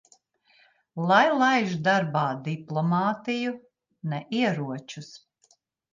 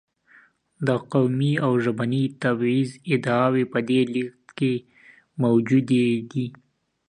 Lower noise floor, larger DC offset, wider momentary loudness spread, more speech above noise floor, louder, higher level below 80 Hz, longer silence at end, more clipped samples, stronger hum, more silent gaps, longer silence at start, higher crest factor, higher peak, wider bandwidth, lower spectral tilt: first, -66 dBFS vs -56 dBFS; neither; first, 19 LU vs 9 LU; first, 41 dB vs 34 dB; about the same, -25 LUFS vs -23 LUFS; second, -74 dBFS vs -66 dBFS; first, 0.75 s vs 0.55 s; neither; neither; neither; first, 0.95 s vs 0.8 s; about the same, 20 dB vs 16 dB; about the same, -6 dBFS vs -6 dBFS; second, 7.6 kHz vs 10 kHz; second, -6 dB/octave vs -7.5 dB/octave